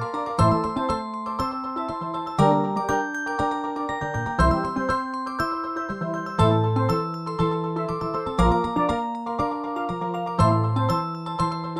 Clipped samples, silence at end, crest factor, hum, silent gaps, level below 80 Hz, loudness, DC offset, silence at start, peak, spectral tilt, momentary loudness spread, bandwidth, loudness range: under 0.1%; 0 s; 18 dB; none; none; -38 dBFS; -24 LUFS; under 0.1%; 0 s; -6 dBFS; -7 dB/octave; 8 LU; 12.5 kHz; 2 LU